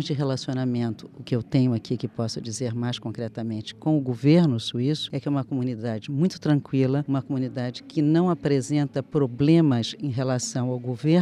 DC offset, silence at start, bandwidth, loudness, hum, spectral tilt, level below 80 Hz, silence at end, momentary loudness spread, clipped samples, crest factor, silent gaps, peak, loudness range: under 0.1%; 0 s; 11.5 kHz; -25 LUFS; none; -6.5 dB/octave; -62 dBFS; 0 s; 10 LU; under 0.1%; 16 dB; none; -8 dBFS; 4 LU